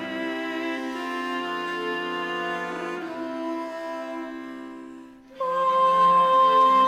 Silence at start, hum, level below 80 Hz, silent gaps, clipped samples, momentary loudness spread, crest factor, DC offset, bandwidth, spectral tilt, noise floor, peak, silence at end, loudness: 0 s; none; -70 dBFS; none; under 0.1%; 18 LU; 14 dB; under 0.1%; 14 kHz; -4.5 dB/octave; -44 dBFS; -10 dBFS; 0 s; -24 LUFS